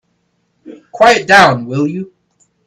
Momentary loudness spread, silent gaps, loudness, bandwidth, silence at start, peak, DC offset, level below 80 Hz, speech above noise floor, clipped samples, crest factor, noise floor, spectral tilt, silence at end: 17 LU; none; -10 LUFS; 14.5 kHz; 0.65 s; 0 dBFS; under 0.1%; -50 dBFS; 53 dB; 0.2%; 14 dB; -63 dBFS; -4.5 dB/octave; 0.6 s